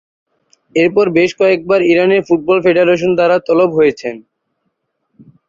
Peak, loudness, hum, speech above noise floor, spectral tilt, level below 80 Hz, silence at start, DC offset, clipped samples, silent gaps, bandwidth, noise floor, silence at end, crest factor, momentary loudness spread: 0 dBFS; -12 LUFS; none; 57 dB; -6.5 dB/octave; -54 dBFS; 0.75 s; under 0.1%; under 0.1%; none; 7.4 kHz; -69 dBFS; 1.3 s; 14 dB; 4 LU